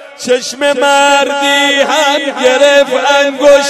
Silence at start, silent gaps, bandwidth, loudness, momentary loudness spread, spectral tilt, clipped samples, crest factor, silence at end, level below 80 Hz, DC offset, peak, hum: 0 s; none; 15 kHz; -9 LUFS; 6 LU; -1 dB/octave; 0.5%; 10 dB; 0 s; -52 dBFS; under 0.1%; 0 dBFS; none